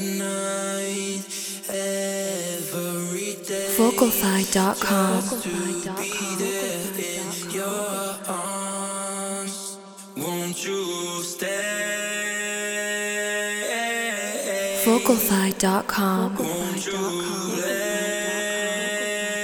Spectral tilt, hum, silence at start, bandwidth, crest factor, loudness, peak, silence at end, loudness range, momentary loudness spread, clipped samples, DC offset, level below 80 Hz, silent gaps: -3.5 dB/octave; none; 0 s; over 20 kHz; 20 dB; -24 LUFS; -4 dBFS; 0 s; 6 LU; 8 LU; under 0.1%; under 0.1%; -60 dBFS; none